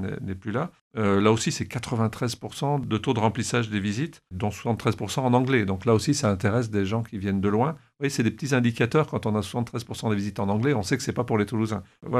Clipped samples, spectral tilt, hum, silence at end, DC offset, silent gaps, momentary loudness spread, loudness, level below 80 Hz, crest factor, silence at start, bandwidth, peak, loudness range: under 0.1%; -6 dB/octave; none; 0 s; under 0.1%; 0.81-0.91 s; 8 LU; -26 LUFS; -56 dBFS; 18 dB; 0 s; 13.5 kHz; -6 dBFS; 2 LU